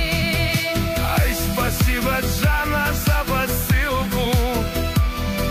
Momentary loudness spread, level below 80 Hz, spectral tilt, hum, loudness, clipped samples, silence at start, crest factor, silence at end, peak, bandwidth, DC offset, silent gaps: 2 LU; -26 dBFS; -4.5 dB/octave; none; -20 LUFS; under 0.1%; 0 s; 12 dB; 0 s; -8 dBFS; 15.5 kHz; under 0.1%; none